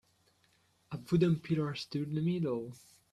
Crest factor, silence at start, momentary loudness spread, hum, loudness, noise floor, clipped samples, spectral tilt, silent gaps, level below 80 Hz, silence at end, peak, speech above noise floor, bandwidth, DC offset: 18 dB; 0.9 s; 17 LU; none; -33 LUFS; -71 dBFS; under 0.1%; -8 dB/octave; none; -66 dBFS; 0.35 s; -16 dBFS; 39 dB; 12.5 kHz; under 0.1%